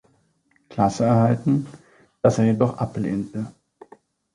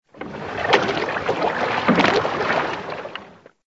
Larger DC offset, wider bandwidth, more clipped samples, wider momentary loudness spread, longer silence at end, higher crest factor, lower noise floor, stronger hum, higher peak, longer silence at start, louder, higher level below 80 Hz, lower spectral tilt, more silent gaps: neither; first, 11 kHz vs 8 kHz; neither; about the same, 15 LU vs 15 LU; first, 0.85 s vs 0.35 s; about the same, 18 dB vs 22 dB; first, -64 dBFS vs -44 dBFS; neither; second, -4 dBFS vs 0 dBFS; first, 0.7 s vs 0.15 s; about the same, -22 LUFS vs -20 LUFS; about the same, -54 dBFS vs -54 dBFS; first, -8 dB/octave vs -5 dB/octave; neither